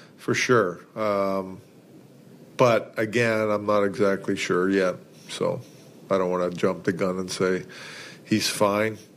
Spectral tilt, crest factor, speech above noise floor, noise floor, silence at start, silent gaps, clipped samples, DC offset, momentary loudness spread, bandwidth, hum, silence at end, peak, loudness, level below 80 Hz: -5 dB/octave; 20 dB; 26 dB; -50 dBFS; 0 s; none; under 0.1%; under 0.1%; 16 LU; 15.5 kHz; none; 0.15 s; -4 dBFS; -24 LUFS; -68 dBFS